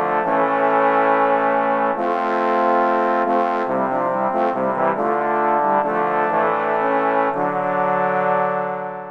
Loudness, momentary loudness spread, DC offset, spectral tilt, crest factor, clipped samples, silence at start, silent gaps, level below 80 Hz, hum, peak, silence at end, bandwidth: -19 LUFS; 4 LU; under 0.1%; -7.5 dB/octave; 14 dB; under 0.1%; 0 s; none; -66 dBFS; none; -4 dBFS; 0 s; 7.2 kHz